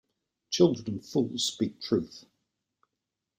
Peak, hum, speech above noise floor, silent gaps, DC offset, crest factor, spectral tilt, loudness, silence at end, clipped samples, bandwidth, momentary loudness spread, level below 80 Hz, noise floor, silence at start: -10 dBFS; none; 58 dB; none; under 0.1%; 22 dB; -5 dB/octave; -29 LUFS; 1.2 s; under 0.1%; 16 kHz; 10 LU; -66 dBFS; -86 dBFS; 0.5 s